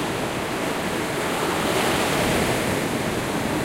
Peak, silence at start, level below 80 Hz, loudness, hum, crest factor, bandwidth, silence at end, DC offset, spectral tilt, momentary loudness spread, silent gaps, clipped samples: -10 dBFS; 0 s; -44 dBFS; -23 LUFS; none; 14 dB; 16 kHz; 0 s; under 0.1%; -4 dB/octave; 5 LU; none; under 0.1%